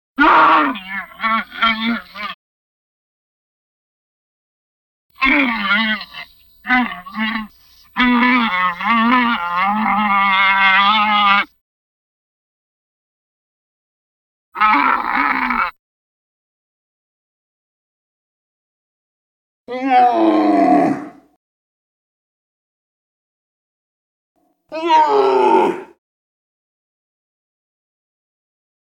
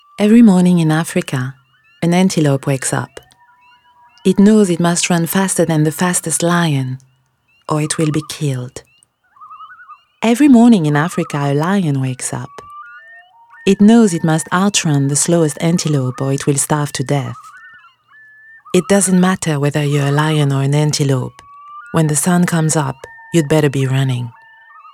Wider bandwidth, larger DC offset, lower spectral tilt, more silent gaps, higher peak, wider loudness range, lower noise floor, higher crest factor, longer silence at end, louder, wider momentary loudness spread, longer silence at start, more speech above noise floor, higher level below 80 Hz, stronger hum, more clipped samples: about the same, 17 kHz vs 16 kHz; neither; about the same, -5 dB/octave vs -5.5 dB/octave; first, 2.34-5.09 s, 11.61-14.52 s, 15.79-19.66 s, 21.36-24.35 s vs none; about the same, -2 dBFS vs 0 dBFS; first, 10 LU vs 5 LU; second, -48 dBFS vs -58 dBFS; about the same, 18 dB vs 14 dB; first, 3.05 s vs 0.65 s; about the same, -15 LUFS vs -14 LUFS; about the same, 15 LU vs 13 LU; about the same, 0.2 s vs 0.2 s; second, 33 dB vs 45 dB; about the same, -52 dBFS vs -54 dBFS; neither; neither